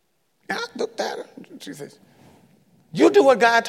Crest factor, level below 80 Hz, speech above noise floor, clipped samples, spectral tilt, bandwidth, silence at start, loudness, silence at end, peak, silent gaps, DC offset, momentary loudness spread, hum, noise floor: 18 dB; -74 dBFS; 40 dB; under 0.1%; -4 dB/octave; 14.5 kHz; 0.5 s; -19 LUFS; 0 s; -4 dBFS; none; under 0.1%; 24 LU; none; -57 dBFS